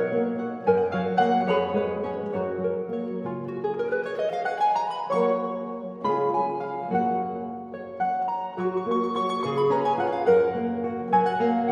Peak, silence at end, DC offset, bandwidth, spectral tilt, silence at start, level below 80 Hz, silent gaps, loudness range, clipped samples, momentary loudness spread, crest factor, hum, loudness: -8 dBFS; 0 s; under 0.1%; 9.4 kHz; -7.5 dB/octave; 0 s; -66 dBFS; none; 3 LU; under 0.1%; 9 LU; 16 dB; none; -26 LUFS